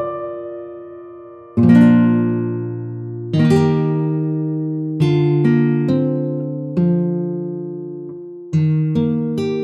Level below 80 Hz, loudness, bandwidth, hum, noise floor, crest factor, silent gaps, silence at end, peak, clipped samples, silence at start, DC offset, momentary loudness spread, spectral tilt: -56 dBFS; -17 LUFS; 8.4 kHz; none; -37 dBFS; 16 dB; none; 0 s; 0 dBFS; under 0.1%; 0 s; under 0.1%; 18 LU; -9.5 dB/octave